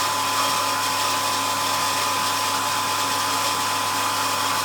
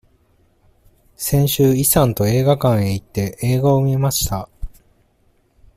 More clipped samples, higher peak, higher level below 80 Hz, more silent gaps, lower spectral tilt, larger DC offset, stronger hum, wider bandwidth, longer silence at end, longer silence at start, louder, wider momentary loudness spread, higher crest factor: neither; second, -10 dBFS vs 0 dBFS; second, -72 dBFS vs -38 dBFS; neither; second, -1 dB/octave vs -5.5 dB/octave; neither; neither; first, over 20 kHz vs 16 kHz; second, 0 s vs 1.1 s; second, 0 s vs 1.2 s; second, -21 LUFS vs -17 LUFS; second, 1 LU vs 12 LU; second, 12 dB vs 18 dB